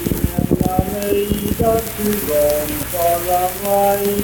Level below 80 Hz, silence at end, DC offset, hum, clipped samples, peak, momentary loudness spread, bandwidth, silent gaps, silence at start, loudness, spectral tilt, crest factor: -32 dBFS; 0 s; under 0.1%; none; under 0.1%; -2 dBFS; 4 LU; 19.5 kHz; none; 0 s; -17 LUFS; -5 dB/octave; 16 dB